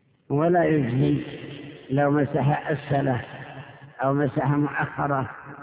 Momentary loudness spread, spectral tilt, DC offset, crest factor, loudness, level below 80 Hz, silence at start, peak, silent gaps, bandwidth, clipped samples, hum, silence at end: 17 LU; -12 dB/octave; under 0.1%; 14 dB; -24 LUFS; -54 dBFS; 0.3 s; -10 dBFS; none; 4 kHz; under 0.1%; none; 0 s